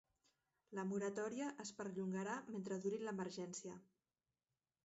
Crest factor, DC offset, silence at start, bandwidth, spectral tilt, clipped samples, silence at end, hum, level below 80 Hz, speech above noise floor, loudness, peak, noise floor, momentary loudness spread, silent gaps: 16 dB; under 0.1%; 0.7 s; 8 kHz; -5.5 dB/octave; under 0.1%; 1 s; none; -88 dBFS; over 44 dB; -46 LUFS; -32 dBFS; under -90 dBFS; 8 LU; none